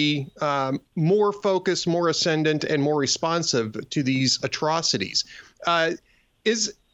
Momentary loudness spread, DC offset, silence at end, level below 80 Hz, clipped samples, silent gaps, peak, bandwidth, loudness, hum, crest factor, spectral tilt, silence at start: 5 LU; under 0.1%; 0.2 s; -64 dBFS; under 0.1%; none; -8 dBFS; 8.4 kHz; -23 LUFS; none; 16 dB; -4 dB/octave; 0 s